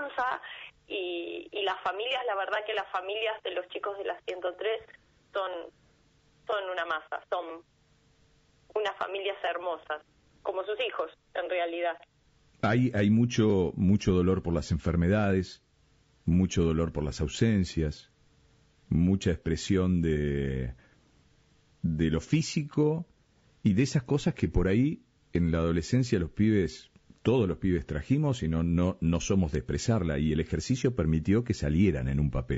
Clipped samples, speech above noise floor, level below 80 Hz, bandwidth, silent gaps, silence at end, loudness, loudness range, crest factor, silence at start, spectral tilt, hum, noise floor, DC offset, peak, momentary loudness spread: under 0.1%; 37 dB; -44 dBFS; 8 kHz; none; 0 s; -29 LUFS; 8 LU; 16 dB; 0 s; -6 dB/octave; none; -65 dBFS; under 0.1%; -14 dBFS; 11 LU